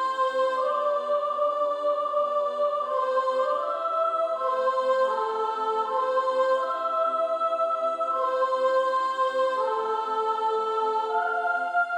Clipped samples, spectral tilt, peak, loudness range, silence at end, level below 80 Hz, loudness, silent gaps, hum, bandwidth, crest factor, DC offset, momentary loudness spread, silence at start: under 0.1%; -2 dB/octave; -14 dBFS; 1 LU; 0 s; -80 dBFS; -25 LUFS; none; none; 10.5 kHz; 12 dB; under 0.1%; 3 LU; 0 s